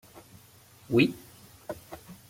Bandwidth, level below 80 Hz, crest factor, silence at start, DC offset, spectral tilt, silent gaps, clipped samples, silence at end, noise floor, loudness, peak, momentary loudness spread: 16.5 kHz; -64 dBFS; 22 dB; 0.9 s; under 0.1%; -6 dB/octave; none; under 0.1%; 0.15 s; -56 dBFS; -26 LUFS; -10 dBFS; 22 LU